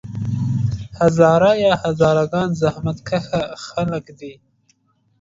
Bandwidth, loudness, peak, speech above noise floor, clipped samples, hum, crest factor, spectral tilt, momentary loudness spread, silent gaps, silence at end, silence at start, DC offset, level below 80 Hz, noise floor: 7.8 kHz; -18 LUFS; 0 dBFS; 44 dB; under 0.1%; none; 18 dB; -7 dB/octave; 13 LU; none; 0.9 s; 0.05 s; under 0.1%; -44 dBFS; -62 dBFS